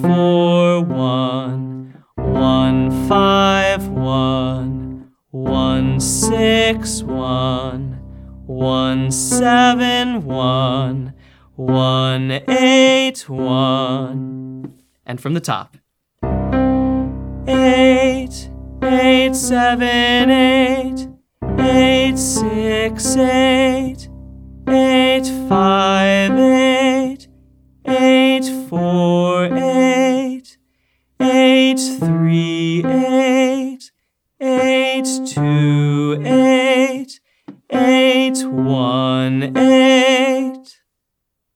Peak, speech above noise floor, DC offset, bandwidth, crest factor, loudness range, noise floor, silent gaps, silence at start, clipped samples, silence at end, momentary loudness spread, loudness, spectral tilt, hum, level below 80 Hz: 0 dBFS; 62 dB; under 0.1%; 16 kHz; 14 dB; 3 LU; -76 dBFS; none; 0 s; under 0.1%; 0.95 s; 14 LU; -15 LUFS; -5 dB/octave; none; -36 dBFS